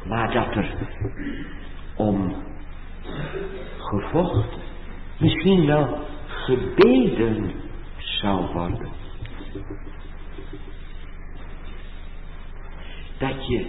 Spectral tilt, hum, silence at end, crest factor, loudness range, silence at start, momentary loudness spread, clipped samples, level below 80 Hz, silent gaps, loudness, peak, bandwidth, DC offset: -10 dB/octave; none; 0 s; 20 dB; 19 LU; 0 s; 23 LU; under 0.1%; -34 dBFS; none; -23 LUFS; -4 dBFS; 5.8 kHz; under 0.1%